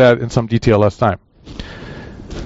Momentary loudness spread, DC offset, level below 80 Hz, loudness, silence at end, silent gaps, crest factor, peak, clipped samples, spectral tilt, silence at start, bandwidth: 20 LU; under 0.1%; -36 dBFS; -15 LUFS; 0 s; none; 14 dB; -2 dBFS; under 0.1%; -6 dB/octave; 0 s; 8 kHz